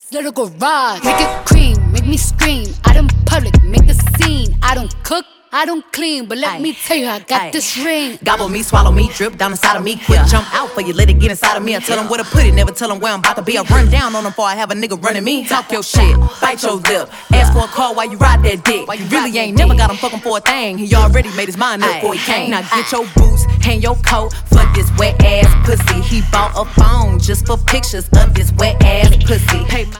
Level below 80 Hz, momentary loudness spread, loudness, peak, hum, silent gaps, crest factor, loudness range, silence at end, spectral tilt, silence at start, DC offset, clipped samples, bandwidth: -14 dBFS; 7 LU; -13 LUFS; 0 dBFS; none; none; 12 dB; 3 LU; 0 s; -4.5 dB/octave; 0.05 s; under 0.1%; under 0.1%; 18 kHz